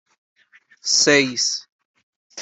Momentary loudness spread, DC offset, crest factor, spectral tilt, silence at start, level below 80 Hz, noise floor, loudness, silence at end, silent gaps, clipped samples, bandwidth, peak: 15 LU; under 0.1%; 20 dB; -1 dB/octave; 0.85 s; -70 dBFS; -53 dBFS; -17 LUFS; 0 s; 1.72-1.79 s, 1.85-1.94 s, 2.03-2.30 s; under 0.1%; 8.4 kHz; -2 dBFS